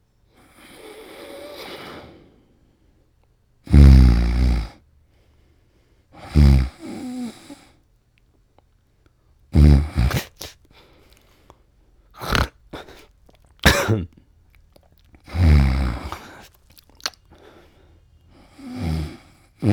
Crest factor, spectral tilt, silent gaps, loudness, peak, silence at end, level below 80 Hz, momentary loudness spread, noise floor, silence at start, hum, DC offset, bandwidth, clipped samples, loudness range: 22 dB; -6 dB/octave; none; -19 LUFS; 0 dBFS; 0 s; -24 dBFS; 25 LU; -60 dBFS; 1.2 s; none; under 0.1%; 17 kHz; under 0.1%; 14 LU